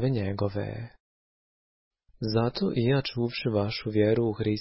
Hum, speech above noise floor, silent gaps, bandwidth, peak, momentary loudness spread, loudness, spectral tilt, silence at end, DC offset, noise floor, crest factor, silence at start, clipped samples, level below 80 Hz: none; over 63 dB; 1.00-1.91 s; 5.8 kHz; -12 dBFS; 11 LU; -28 LUFS; -10.5 dB/octave; 0 s; under 0.1%; under -90 dBFS; 16 dB; 0 s; under 0.1%; -52 dBFS